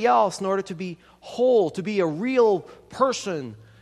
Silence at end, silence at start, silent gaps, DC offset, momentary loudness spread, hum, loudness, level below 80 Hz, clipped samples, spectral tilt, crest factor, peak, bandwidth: 0.25 s; 0 s; none; under 0.1%; 17 LU; none; -23 LUFS; -64 dBFS; under 0.1%; -5 dB/octave; 18 dB; -6 dBFS; 12 kHz